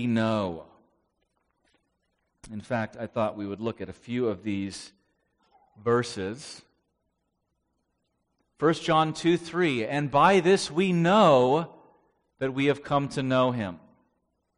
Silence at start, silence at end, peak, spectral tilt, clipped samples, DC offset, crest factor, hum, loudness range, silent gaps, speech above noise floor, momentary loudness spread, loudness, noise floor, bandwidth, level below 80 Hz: 0 s; 0.8 s; -6 dBFS; -6 dB/octave; under 0.1%; under 0.1%; 22 dB; none; 12 LU; none; 53 dB; 16 LU; -26 LUFS; -78 dBFS; 10.5 kHz; -62 dBFS